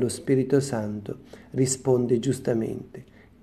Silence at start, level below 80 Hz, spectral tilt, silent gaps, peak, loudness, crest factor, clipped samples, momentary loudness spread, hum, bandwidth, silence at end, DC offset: 0 s; -58 dBFS; -6 dB/octave; none; -8 dBFS; -25 LUFS; 18 dB; under 0.1%; 16 LU; none; 13.5 kHz; 0.4 s; under 0.1%